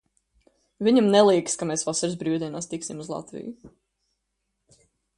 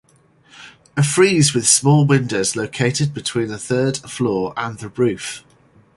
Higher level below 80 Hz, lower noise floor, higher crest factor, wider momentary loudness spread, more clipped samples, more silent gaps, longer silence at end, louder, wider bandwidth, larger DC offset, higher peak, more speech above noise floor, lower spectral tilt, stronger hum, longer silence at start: second, -66 dBFS vs -54 dBFS; first, -78 dBFS vs -54 dBFS; about the same, 20 dB vs 18 dB; first, 17 LU vs 14 LU; neither; neither; first, 1.5 s vs 0.55 s; second, -23 LUFS vs -17 LUFS; about the same, 11.5 kHz vs 11.5 kHz; neither; second, -6 dBFS vs 0 dBFS; first, 55 dB vs 36 dB; about the same, -4.5 dB/octave vs -4.5 dB/octave; neither; first, 0.8 s vs 0.6 s